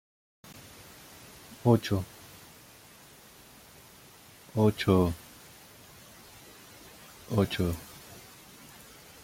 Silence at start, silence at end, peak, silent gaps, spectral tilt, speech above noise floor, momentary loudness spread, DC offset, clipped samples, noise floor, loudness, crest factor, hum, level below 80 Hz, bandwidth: 0.5 s; 1.05 s; -10 dBFS; none; -6.5 dB/octave; 28 dB; 26 LU; under 0.1%; under 0.1%; -54 dBFS; -28 LUFS; 24 dB; none; -58 dBFS; 16.5 kHz